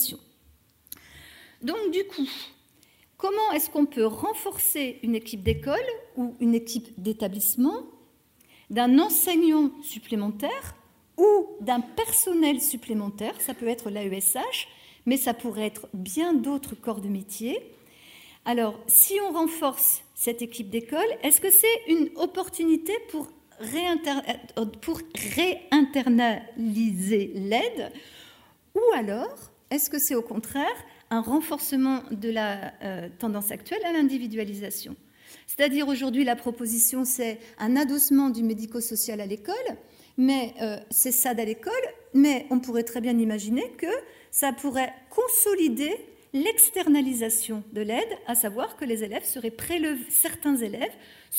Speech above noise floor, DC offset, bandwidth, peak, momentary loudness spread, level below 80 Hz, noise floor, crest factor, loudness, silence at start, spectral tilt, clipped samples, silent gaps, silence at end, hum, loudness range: 35 dB; under 0.1%; 16 kHz; -2 dBFS; 13 LU; -60 dBFS; -61 dBFS; 24 dB; -25 LUFS; 0 s; -3 dB/octave; under 0.1%; none; 0 s; none; 6 LU